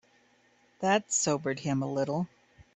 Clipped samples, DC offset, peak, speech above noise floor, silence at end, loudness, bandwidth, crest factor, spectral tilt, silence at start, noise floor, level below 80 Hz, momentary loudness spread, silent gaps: under 0.1%; under 0.1%; -10 dBFS; 36 dB; 0.15 s; -30 LUFS; 8.6 kHz; 22 dB; -4 dB/octave; 0.8 s; -66 dBFS; -68 dBFS; 8 LU; none